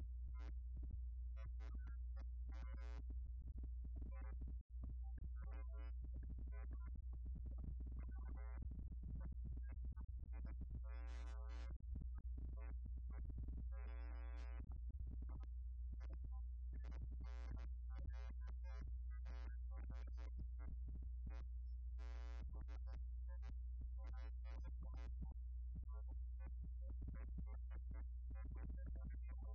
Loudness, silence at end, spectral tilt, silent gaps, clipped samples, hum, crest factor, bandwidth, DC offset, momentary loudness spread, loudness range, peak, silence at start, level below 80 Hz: -53 LUFS; 0 s; -8 dB/octave; 4.61-4.70 s; under 0.1%; none; 10 dB; 5.2 kHz; under 0.1%; 1 LU; 0 LU; -38 dBFS; 0 s; -50 dBFS